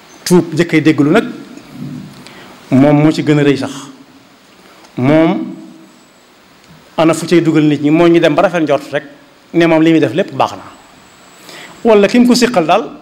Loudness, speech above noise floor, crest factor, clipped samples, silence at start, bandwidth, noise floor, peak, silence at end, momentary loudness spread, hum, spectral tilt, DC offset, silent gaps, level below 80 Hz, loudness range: -11 LUFS; 34 dB; 12 dB; under 0.1%; 0.25 s; 15.5 kHz; -44 dBFS; 0 dBFS; 0.05 s; 20 LU; none; -6 dB/octave; under 0.1%; none; -50 dBFS; 5 LU